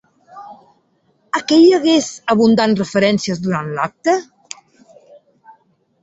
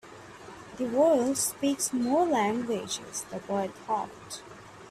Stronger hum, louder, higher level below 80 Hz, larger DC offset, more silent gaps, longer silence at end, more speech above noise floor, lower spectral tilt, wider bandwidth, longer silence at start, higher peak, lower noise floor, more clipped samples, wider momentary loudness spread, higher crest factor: neither; first, -15 LUFS vs -28 LUFS; first, -58 dBFS vs -66 dBFS; neither; neither; first, 1.8 s vs 0 s; first, 46 dB vs 19 dB; first, -5 dB/octave vs -3.5 dB/octave; second, 8 kHz vs 15.5 kHz; first, 0.35 s vs 0.05 s; first, -2 dBFS vs -12 dBFS; first, -60 dBFS vs -47 dBFS; neither; about the same, 24 LU vs 22 LU; about the same, 16 dB vs 16 dB